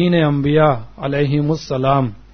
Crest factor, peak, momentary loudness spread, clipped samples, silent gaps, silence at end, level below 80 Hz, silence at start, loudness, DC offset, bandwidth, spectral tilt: 16 dB; 0 dBFS; 6 LU; under 0.1%; none; 0.15 s; -42 dBFS; 0 s; -17 LUFS; under 0.1%; 6.6 kHz; -8 dB/octave